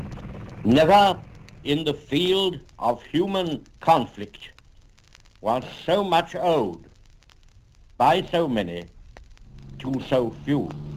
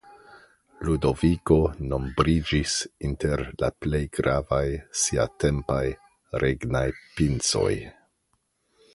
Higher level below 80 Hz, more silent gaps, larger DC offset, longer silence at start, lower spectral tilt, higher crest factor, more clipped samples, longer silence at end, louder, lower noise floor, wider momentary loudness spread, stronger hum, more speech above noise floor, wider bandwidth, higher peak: second, -50 dBFS vs -38 dBFS; neither; neither; about the same, 0 s vs 0.05 s; about the same, -6 dB/octave vs -5 dB/octave; about the same, 20 dB vs 22 dB; neither; second, 0 s vs 1.05 s; about the same, -23 LUFS vs -25 LUFS; second, -53 dBFS vs -72 dBFS; first, 18 LU vs 8 LU; neither; second, 31 dB vs 48 dB; first, 16 kHz vs 11.5 kHz; about the same, -4 dBFS vs -4 dBFS